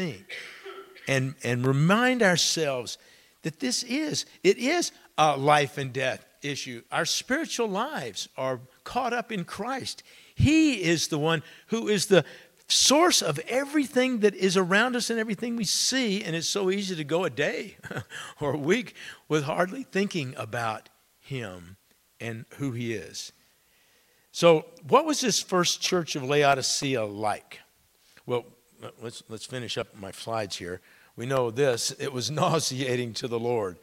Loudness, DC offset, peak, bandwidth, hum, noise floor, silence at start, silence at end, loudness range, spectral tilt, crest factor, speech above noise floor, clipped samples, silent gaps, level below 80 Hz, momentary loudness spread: -26 LUFS; under 0.1%; -4 dBFS; 16.5 kHz; none; -63 dBFS; 0 s; 0.05 s; 10 LU; -3.5 dB/octave; 22 dB; 37 dB; under 0.1%; none; -58 dBFS; 17 LU